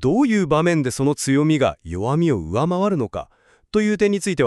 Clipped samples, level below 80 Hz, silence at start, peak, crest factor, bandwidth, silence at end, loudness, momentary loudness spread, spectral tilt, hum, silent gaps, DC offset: under 0.1%; -46 dBFS; 0 s; -4 dBFS; 14 dB; 13 kHz; 0 s; -20 LUFS; 7 LU; -6 dB/octave; none; none; under 0.1%